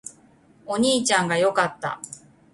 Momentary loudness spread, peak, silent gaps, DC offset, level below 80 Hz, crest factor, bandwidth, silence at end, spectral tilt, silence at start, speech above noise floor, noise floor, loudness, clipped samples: 20 LU; -6 dBFS; none; under 0.1%; -64 dBFS; 18 dB; 11.5 kHz; 0.35 s; -3 dB/octave; 0.05 s; 33 dB; -55 dBFS; -22 LUFS; under 0.1%